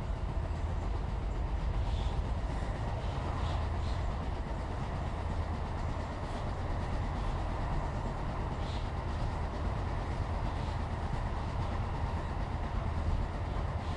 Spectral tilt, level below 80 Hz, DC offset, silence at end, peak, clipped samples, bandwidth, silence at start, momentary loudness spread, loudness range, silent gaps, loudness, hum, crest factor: -7 dB/octave; -38 dBFS; under 0.1%; 0 s; -22 dBFS; under 0.1%; 10.5 kHz; 0 s; 2 LU; 1 LU; none; -37 LUFS; none; 12 dB